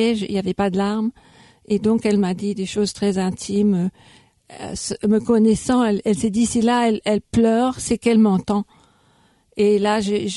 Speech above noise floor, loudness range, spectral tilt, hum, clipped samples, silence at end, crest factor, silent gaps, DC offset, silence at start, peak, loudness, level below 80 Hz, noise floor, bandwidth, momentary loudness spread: 39 dB; 3 LU; -5.5 dB/octave; none; under 0.1%; 0 s; 14 dB; none; under 0.1%; 0 s; -4 dBFS; -19 LUFS; -48 dBFS; -58 dBFS; 11.5 kHz; 8 LU